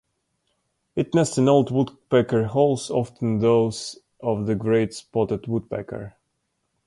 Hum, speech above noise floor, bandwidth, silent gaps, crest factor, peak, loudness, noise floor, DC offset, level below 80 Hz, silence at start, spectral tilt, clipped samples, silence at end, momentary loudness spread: none; 53 dB; 11.5 kHz; none; 18 dB; -6 dBFS; -22 LUFS; -75 dBFS; under 0.1%; -54 dBFS; 0.95 s; -6.5 dB/octave; under 0.1%; 0.75 s; 13 LU